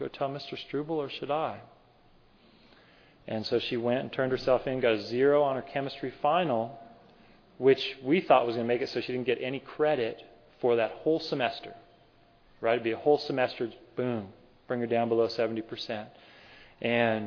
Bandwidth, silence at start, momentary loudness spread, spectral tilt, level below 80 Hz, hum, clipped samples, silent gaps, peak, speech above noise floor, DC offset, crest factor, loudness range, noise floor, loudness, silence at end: 5.4 kHz; 0 s; 12 LU; -7 dB/octave; -64 dBFS; none; under 0.1%; none; -10 dBFS; 32 dB; under 0.1%; 20 dB; 6 LU; -61 dBFS; -29 LUFS; 0 s